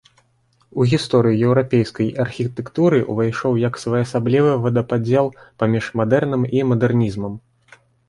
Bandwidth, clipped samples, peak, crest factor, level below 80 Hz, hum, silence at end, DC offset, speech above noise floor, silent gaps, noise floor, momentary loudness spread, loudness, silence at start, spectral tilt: 11 kHz; under 0.1%; -4 dBFS; 16 dB; -52 dBFS; none; 0.7 s; under 0.1%; 43 dB; none; -61 dBFS; 7 LU; -19 LUFS; 0.75 s; -7.5 dB/octave